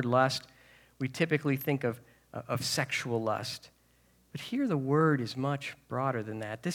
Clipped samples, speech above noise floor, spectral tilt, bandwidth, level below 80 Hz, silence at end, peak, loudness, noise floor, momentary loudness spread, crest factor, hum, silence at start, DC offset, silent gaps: under 0.1%; 35 dB; -5.5 dB/octave; 19 kHz; -72 dBFS; 0 s; -12 dBFS; -31 LUFS; -66 dBFS; 14 LU; 20 dB; none; 0 s; under 0.1%; none